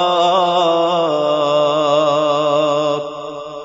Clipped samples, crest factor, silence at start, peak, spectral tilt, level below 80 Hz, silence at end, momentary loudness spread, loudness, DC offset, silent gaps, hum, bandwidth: under 0.1%; 12 dB; 0 s; -4 dBFS; -4.5 dB/octave; -62 dBFS; 0 s; 8 LU; -15 LUFS; under 0.1%; none; none; 7.8 kHz